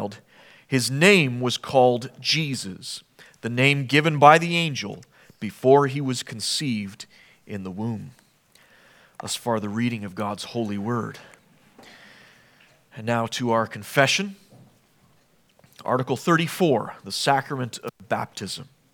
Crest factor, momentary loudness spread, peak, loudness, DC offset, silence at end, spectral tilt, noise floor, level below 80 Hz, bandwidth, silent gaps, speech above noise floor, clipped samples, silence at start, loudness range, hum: 24 dB; 17 LU; 0 dBFS; -22 LUFS; under 0.1%; 0.3 s; -4.5 dB/octave; -61 dBFS; -70 dBFS; 19 kHz; none; 38 dB; under 0.1%; 0 s; 11 LU; none